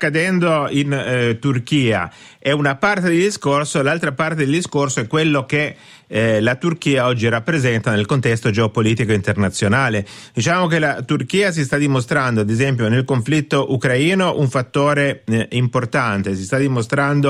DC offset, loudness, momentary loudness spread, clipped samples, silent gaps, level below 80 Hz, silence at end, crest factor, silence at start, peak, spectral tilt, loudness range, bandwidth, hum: under 0.1%; -17 LUFS; 4 LU; under 0.1%; none; -52 dBFS; 0 s; 14 dB; 0 s; -4 dBFS; -5.5 dB/octave; 1 LU; 12.5 kHz; none